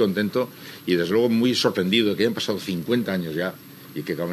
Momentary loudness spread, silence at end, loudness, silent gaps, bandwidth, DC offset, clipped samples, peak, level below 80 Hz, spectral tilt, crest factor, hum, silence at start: 12 LU; 0 s; -23 LUFS; none; 13.5 kHz; under 0.1%; under 0.1%; -6 dBFS; -70 dBFS; -5.5 dB/octave; 18 dB; none; 0 s